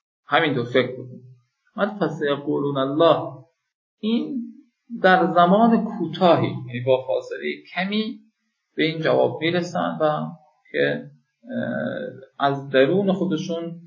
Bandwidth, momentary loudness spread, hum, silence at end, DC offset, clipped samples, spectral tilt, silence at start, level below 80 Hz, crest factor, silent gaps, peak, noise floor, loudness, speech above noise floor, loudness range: 7.4 kHz; 15 LU; none; 0.05 s; under 0.1%; under 0.1%; -7 dB/octave; 0.3 s; -72 dBFS; 20 dB; 3.74-3.97 s; -2 dBFS; -68 dBFS; -22 LUFS; 47 dB; 4 LU